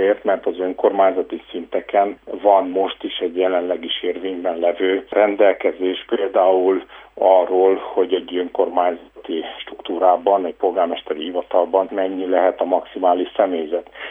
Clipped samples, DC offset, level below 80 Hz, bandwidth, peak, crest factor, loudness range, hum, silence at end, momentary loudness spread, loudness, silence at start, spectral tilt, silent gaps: under 0.1%; under 0.1%; -60 dBFS; 3.8 kHz; 0 dBFS; 18 dB; 3 LU; none; 0 s; 11 LU; -19 LUFS; 0 s; -7 dB/octave; none